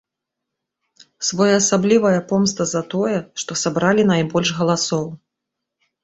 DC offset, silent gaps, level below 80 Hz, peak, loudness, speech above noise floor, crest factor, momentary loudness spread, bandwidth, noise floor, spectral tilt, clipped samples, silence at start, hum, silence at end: under 0.1%; none; -58 dBFS; -2 dBFS; -18 LUFS; 64 dB; 18 dB; 9 LU; 8.2 kHz; -82 dBFS; -4.5 dB/octave; under 0.1%; 1.2 s; none; 0.9 s